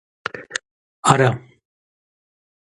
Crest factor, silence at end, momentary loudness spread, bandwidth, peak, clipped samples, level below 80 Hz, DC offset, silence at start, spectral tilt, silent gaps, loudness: 24 dB; 1.25 s; 16 LU; 11.5 kHz; 0 dBFS; under 0.1%; -56 dBFS; under 0.1%; 0.35 s; -4.5 dB/octave; 0.71-1.03 s; -19 LUFS